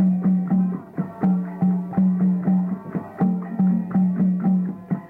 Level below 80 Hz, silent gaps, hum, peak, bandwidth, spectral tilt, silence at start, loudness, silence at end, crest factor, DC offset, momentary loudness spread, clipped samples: -58 dBFS; none; none; -12 dBFS; 2.5 kHz; -12.5 dB/octave; 0 s; -22 LUFS; 0 s; 10 dB; under 0.1%; 7 LU; under 0.1%